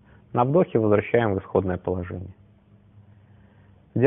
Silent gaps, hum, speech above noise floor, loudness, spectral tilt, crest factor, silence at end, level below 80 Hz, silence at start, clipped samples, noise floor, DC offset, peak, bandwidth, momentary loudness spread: none; none; 32 dB; -23 LUFS; -12.5 dB/octave; 20 dB; 0 s; -58 dBFS; 0.35 s; under 0.1%; -55 dBFS; under 0.1%; -4 dBFS; 3.8 kHz; 14 LU